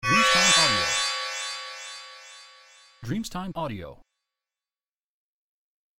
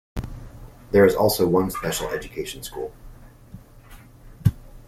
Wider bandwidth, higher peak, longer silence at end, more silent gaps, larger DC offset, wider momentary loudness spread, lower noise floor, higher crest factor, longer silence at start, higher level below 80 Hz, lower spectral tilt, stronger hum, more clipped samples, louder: about the same, 16.5 kHz vs 16 kHz; second, -8 dBFS vs -2 dBFS; first, 2.05 s vs 0.1 s; neither; neither; first, 24 LU vs 19 LU; first, under -90 dBFS vs -46 dBFS; about the same, 20 dB vs 22 dB; about the same, 0.05 s vs 0.15 s; second, -54 dBFS vs -42 dBFS; second, -1.5 dB/octave vs -5.5 dB/octave; neither; neither; about the same, -23 LUFS vs -22 LUFS